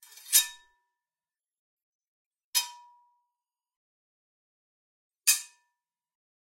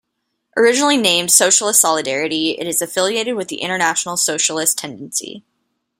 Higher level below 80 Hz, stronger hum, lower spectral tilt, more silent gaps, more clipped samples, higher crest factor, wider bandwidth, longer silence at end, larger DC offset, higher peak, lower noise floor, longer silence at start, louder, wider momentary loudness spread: second, -88 dBFS vs -66 dBFS; neither; second, 8 dB/octave vs -1 dB/octave; first, 1.59-1.77 s, 1.83-1.99 s, 2.08-2.31 s, 2.44-2.53 s, 3.76-5.10 s vs none; neither; first, 30 dB vs 18 dB; about the same, 16 kHz vs 16.5 kHz; first, 1.05 s vs 0.6 s; neither; second, -4 dBFS vs 0 dBFS; first, under -90 dBFS vs -73 dBFS; second, 0.3 s vs 0.55 s; second, -26 LUFS vs -15 LUFS; about the same, 10 LU vs 12 LU